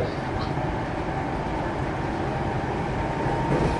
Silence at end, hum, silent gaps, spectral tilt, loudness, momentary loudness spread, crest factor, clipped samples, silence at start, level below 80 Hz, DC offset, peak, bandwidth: 0 s; none; none; -7 dB/octave; -27 LUFS; 3 LU; 14 dB; under 0.1%; 0 s; -36 dBFS; under 0.1%; -12 dBFS; 11.5 kHz